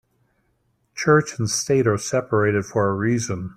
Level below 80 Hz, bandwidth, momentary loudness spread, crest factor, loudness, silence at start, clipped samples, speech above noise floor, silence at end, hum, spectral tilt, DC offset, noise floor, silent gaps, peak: -56 dBFS; 14 kHz; 6 LU; 18 dB; -21 LUFS; 0.95 s; under 0.1%; 47 dB; 0.05 s; none; -5 dB/octave; under 0.1%; -67 dBFS; none; -4 dBFS